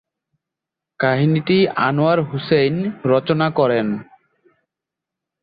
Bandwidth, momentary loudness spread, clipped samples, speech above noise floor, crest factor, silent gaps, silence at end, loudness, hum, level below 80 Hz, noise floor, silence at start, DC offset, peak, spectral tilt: 5 kHz; 5 LU; under 0.1%; 68 dB; 16 dB; none; 1.4 s; -18 LUFS; none; -58 dBFS; -85 dBFS; 1 s; under 0.1%; -4 dBFS; -11 dB/octave